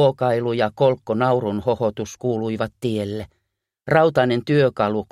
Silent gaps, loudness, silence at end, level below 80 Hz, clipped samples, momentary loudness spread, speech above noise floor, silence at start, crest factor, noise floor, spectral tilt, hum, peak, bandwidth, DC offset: none; -21 LUFS; 0.1 s; -54 dBFS; under 0.1%; 9 LU; 56 dB; 0 s; 16 dB; -76 dBFS; -7 dB/octave; none; -4 dBFS; 13.5 kHz; under 0.1%